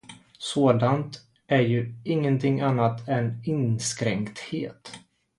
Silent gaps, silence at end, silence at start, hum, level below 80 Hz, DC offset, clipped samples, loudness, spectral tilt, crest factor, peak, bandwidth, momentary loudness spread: none; 0.4 s; 0.1 s; none; -62 dBFS; under 0.1%; under 0.1%; -25 LUFS; -6 dB/octave; 20 dB; -6 dBFS; 11.5 kHz; 14 LU